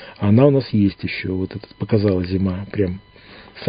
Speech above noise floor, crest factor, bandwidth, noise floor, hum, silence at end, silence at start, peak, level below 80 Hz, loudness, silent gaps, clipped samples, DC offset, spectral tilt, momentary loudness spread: 25 dB; 20 dB; 5.2 kHz; -43 dBFS; none; 0 s; 0 s; 0 dBFS; -40 dBFS; -19 LUFS; none; under 0.1%; under 0.1%; -13 dB/octave; 12 LU